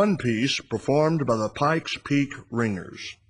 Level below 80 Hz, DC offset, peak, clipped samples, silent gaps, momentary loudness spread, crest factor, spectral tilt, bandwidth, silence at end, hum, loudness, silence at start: -58 dBFS; under 0.1%; -8 dBFS; under 0.1%; none; 6 LU; 16 dB; -5.5 dB/octave; 10.5 kHz; 0.15 s; none; -25 LUFS; 0 s